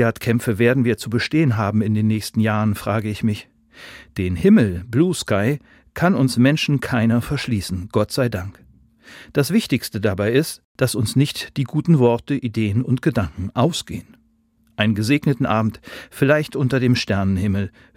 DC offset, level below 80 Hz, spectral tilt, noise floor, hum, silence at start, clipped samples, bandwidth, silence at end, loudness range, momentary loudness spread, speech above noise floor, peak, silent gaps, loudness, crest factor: under 0.1%; -50 dBFS; -6.5 dB/octave; -60 dBFS; none; 0 s; under 0.1%; 16.5 kHz; 0.3 s; 3 LU; 9 LU; 41 dB; 0 dBFS; 10.64-10.75 s; -20 LUFS; 18 dB